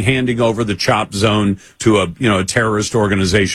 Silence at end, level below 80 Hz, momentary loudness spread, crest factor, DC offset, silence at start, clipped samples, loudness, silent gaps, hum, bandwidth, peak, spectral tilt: 0 s; -40 dBFS; 2 LU; 14 dB; under 0.1%; 0 s; under 0.1%; -15 LUFS; none; none; 14.5 kHz; 0 dBFS; -5 dB/octave